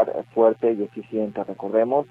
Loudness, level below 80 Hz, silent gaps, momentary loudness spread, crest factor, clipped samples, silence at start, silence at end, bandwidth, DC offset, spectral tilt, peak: -23 LUFS; -68 dBFS; none; 10 LU; 16 dB; under 0.1%; 0 s; 0.05 s; 4.1 kHz; under 0.1%; -9.5 dB/octave; -6 dBFS